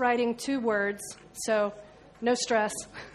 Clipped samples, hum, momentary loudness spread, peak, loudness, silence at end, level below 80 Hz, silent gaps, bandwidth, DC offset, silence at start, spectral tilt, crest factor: under 0.1%; none; 12 LU; -12 dBFS; -29 LUFS; 0 s; -64 dBFS; none; 13 kHz; under 0.1%; 0 s; -3 dB/octave; 18 dB